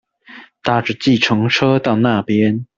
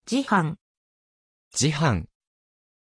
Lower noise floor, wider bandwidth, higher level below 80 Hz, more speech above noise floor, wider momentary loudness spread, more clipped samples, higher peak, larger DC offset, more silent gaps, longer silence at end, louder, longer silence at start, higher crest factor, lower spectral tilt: second, -41 dBFS vs under -90 dBFS; second, 7.6 kHz vs 10.5 kHz; about the same, -52 dBFS vs -50 dBFS; second, 26 dB vs over 67 dB; second, 4 LU vs 15 LU; neither; first, 0 dBFS vs -8 dBFS; neither; second, none vs 0.61-1.51 s; second, 0.15 s vs 0.9 s; first, -15 LUFS vs -24 LUFS; first, 0.3 s vs 0.05 s; about the same, 16 dB vs 20 dB; first, -6 dB/octave vs -4.5 dB/octave